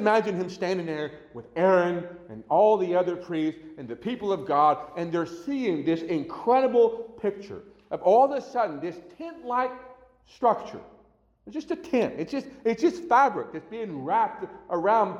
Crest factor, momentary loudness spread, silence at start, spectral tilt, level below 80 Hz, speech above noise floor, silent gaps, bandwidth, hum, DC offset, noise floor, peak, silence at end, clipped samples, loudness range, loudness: 16 dB; 17 LU; 0 s; -6.5 dB/octave; -66 dBFS; 35 dB; none; 11 kHz; none; under 0.1%; -61 dBFS; -10 dBFS; 0 s; under 0.1%; 5 LU; -26 LUFS